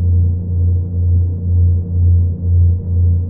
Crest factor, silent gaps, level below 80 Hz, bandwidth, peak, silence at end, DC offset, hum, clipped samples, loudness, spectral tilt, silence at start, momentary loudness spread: 8 dB; none; -28 dBFS; 1 kHz; -4 dBFS; 0 s; under 0.1%; none; under 0.1%; -15 LUFS; -17.5 dB/octave; 0 s; 3 LU